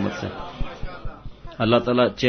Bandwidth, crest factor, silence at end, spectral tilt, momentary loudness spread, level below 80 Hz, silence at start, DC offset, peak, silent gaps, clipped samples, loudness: 6.6 kHz; 20 dB; 0 s; -6.5 dB/octave; 21 LU; -38 dBFS; 0 s; under 0.1%; -4 dBFS; none; under 0.1%; -23 LUFS